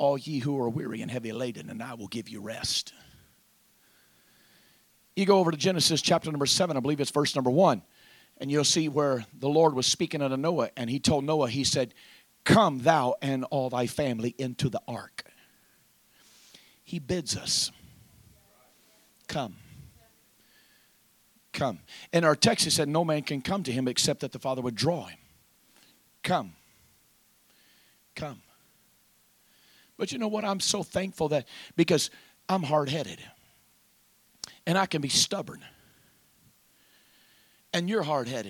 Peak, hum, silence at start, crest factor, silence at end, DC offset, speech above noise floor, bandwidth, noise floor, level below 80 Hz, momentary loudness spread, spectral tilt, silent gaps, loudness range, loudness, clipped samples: -6 dBFS; none; 0 s; 24 dB; 0 s; under 0.1%; 37 dB; 19 kHz; -64 dBFS; -62 dBFS; 16 LU; -4 dB/octave; none; 12 LU; -27 LUFS; under 0.1%